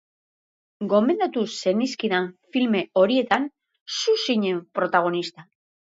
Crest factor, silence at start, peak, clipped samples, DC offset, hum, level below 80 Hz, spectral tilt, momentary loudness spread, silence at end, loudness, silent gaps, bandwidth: 20 dB; 0.8 s; -4 dBFS; under 0.1%; under 0.1%; none; -74 dBFS; -4.5 dB/octave; 8 LU; 0.5 s; -23 LUFS; 3.81-3.86 s; 8 kHz